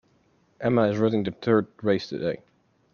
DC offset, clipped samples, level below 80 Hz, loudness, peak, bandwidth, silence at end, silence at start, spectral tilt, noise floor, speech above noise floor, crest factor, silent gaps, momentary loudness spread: under 0.1%; under 0.1%; -62 dBFS; -25 LUFS; -8 dBFS; 7 kHz; 0.6 s; 0.6 s; -8 dB/octave; -64 dBFS; 40 dB; 18 dB; none; 8 LU